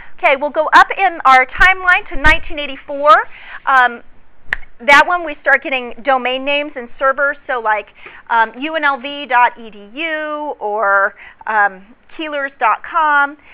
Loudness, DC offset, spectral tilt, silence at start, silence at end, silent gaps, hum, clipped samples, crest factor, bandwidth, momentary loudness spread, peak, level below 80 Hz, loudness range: -14 LUFS; under 0.1%; -6.5 dB/octave; 0 s; 0.2 s; none; none; 0.6%; 14 dB; 4 kHz; 14 LU; 0 dBFS; -36 dBFS; 6 LU